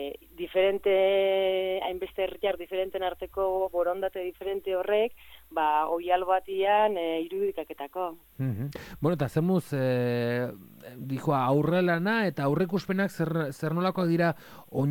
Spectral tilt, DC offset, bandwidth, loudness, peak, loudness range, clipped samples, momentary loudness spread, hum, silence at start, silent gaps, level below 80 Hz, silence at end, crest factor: -7 dB/octave; under 0.1%; 17.5 kHz; -28 LUFS; -12 dBFS; 3 LU; under 0.1%; 11 LU; none; 0 s; none; -60 dBFS; 0 s; 16 dB